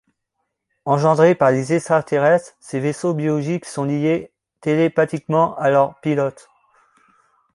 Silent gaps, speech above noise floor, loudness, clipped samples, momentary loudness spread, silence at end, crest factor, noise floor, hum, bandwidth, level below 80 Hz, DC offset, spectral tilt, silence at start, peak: none; 58 dB; -19 LUFS; under 0.1%; 10 LU; 1.25 s; 18 dB; -76 dBFS; none; 11.5 kHz; -62 dBFS; under 0.1%; -7 dB/octave; 0.85 s; -2 dBFS